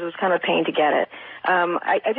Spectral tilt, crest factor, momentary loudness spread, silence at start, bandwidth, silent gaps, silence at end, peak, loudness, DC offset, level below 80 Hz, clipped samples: -9 dB/octave; 14 dB; 5 LU; 0 s; 4.7 kHz; none; 0 s; -8 dBFS; -21 LUFS; under 0.1%; -76 dBFS; under 0.1%